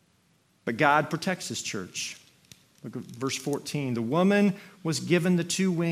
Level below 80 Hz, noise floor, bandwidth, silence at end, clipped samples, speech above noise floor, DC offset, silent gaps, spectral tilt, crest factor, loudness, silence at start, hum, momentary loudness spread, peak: -70 dBFS; -66 dBFS; 16 kHz; 0 s; under 0.1%; 39 dB; under 0.1%; none; -5 dB/octave; 22 dB; -27 LUFS; 0.65 s; none; 15 LU; -6 dBFS